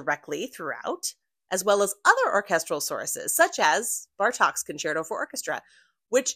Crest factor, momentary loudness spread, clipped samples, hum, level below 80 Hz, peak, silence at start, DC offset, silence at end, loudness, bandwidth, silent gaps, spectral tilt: 22 dB; 12 LU; under 0.1%; none; -76 dBFS; -4 dBFS; 0 s; under 0.1%; 0 s; -25 LUFS; 16 kHz; none; -1.5 dB/octave